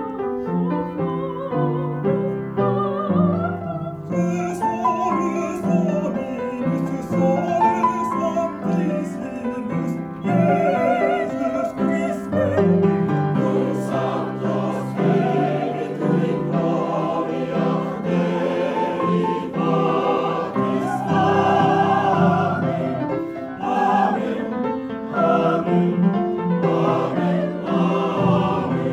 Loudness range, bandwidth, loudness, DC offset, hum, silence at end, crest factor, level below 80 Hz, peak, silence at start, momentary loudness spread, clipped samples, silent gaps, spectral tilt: 3 LU; 10.5 kHz; -21 LUFS; under 0.1%; none; 0 s; 16 dB; -56 dBFS; -4 dBFS; 0 s; 7 LU; under 0.1%; none; -8 dB/octave